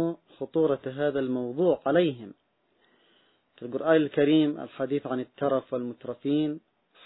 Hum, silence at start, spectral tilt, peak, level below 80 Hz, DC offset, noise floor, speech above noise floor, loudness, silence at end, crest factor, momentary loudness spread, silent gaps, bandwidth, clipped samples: none; 0 s; -10.5 dB/octave; -10 dBFS; -68 dBFS; under 0.1%; -68 dBFS; 42 dB; -27 LUFS; 0.5 s; 18 dB; 14 LU; none; 4.1 kHz; under 0.1%